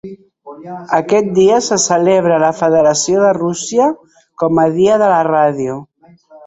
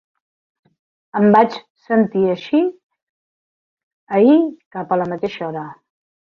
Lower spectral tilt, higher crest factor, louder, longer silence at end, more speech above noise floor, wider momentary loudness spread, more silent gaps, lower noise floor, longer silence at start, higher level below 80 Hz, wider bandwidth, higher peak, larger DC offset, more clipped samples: second, -4.5 dB/octave vs -8.5 dB/octave; second, 12 dB vs 18 dB; first, -13 LUFS vs -17 LUFS; second, 0.1 s vs 0.55 s; second, 31 dB vs over 74 dB; second, 11 LU vs 15 LU; second, none vs 1.70-1.75 s, 2.83-2.90 s, 3.03-3.77 s, 3.83-4.07 s, 4.66-4.71 s; second, -43 dBFS vs under -90 dBFS; second, 0.05 s vs 1.15 s; first, -54 dBFS vs -64 dBFS; first, 8.4 kHz vs 6.6 kHz; about the same, 0 dBFS vs -2 dBFS; neither; neither